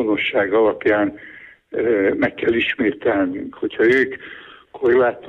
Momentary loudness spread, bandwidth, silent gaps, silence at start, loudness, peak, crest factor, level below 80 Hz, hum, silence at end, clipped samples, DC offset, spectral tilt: 15 LU; 6.6 kHz; none; 0 s; -19 LUFS; -6 dBFS; 14 dB; -54 dBFS; none; 0 s; under 0.1%; under 0.1%; -7 dB/octave